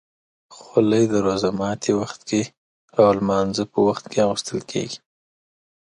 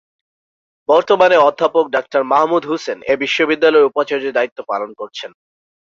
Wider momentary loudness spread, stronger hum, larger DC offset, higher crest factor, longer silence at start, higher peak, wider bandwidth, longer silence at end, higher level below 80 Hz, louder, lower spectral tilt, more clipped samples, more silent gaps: second, 10 LU vs 16 LU; neither; neither; about the same, 18 dB vs 16 dB; second, 0.5 s vs 0.9 s; about the same, -2 dBFS vs 0 dBFS; first, 11 kHz vs 7.4 kHz; first, 1 s vs 0.65 s; first, -56 dBFS vs -64 dBFS; second, -21 LUFS vs -15 LUFS; first, -5.5 dB/octave vs -4 dB/octave; neither; first, 2.57-2.88 s vs 4.52-4.56 s